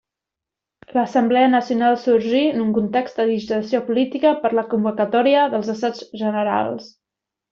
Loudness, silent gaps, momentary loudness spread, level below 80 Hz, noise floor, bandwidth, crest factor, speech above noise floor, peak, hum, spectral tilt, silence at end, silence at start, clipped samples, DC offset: -19 LUFS; none; 8 LU; -62 dBFS; -86 dBFS; 7.2 kHz; 14 dB; 67 dB; -4 dBFS; none; -6.5 dB/octave; 0.65 s; 0.95 s; under 0.1%; under 0.1%